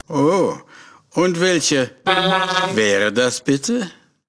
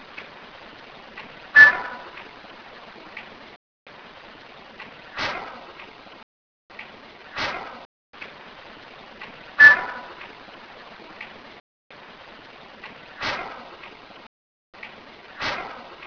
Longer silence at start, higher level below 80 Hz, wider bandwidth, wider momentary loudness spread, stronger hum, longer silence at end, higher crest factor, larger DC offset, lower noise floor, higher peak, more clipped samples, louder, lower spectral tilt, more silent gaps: about the same, 0.1 s vs 0.15 s; about the same, -60 dBFS vs -60 dBFS; first, 11 kHz vs 5.4 kHz; second, 7 LU vs 31 LU; neither; first, 0.35 s vs 0 s; second, 18 dB vs 26 dB; neither; about the same, -45 dBFS vs -45 dBFS; about the same, 0 dBFS vs 0 dBFS; neither; about the same, -18 LUFS vs -17 LUFS; about the same, -3.5 dB/octave vs -2.5 dB/octave; second, none vs 3.56-3.86 s, 6.23-6.69 s, 7.85-8.13 s, 11.60-11.90 s, 14.27-14.73 s